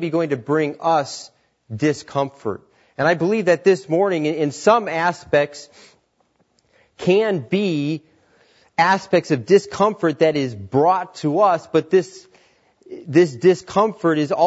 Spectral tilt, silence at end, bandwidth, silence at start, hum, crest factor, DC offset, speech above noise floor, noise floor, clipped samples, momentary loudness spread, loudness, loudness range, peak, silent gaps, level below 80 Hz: -6 dB/octave; 0 s; 8 kHz; 0 s; none; 18 dB; under 0.1%; 45 dB; -64 dBFS; under 0.1%; 11 LU; -19 LUFS; 4 LU; -2 dBFS; none; -64 dBFS